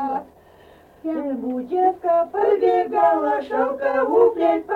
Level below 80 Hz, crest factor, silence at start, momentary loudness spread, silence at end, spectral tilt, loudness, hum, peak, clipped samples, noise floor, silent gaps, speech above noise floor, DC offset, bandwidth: -60 dBFS; 14 dB; 0 s; 10 LU; 0 s; -7 dB/octave; -20 LUFS; none; -6 dBFS; under 0.1%; -49 dBFS; none; 30 dB; under 0.1%; 5.2 kHz